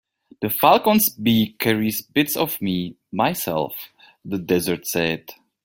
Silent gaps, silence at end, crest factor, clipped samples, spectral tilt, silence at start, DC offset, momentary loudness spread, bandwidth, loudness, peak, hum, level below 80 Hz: none; 0.3 s; 20 dB; under 0.1%; -4.5 dB/octave; 0.4 s; under 0.1%; 14 LU; 17 kHz; -21 LUFS; 0 dBFS; none; -58 dBFS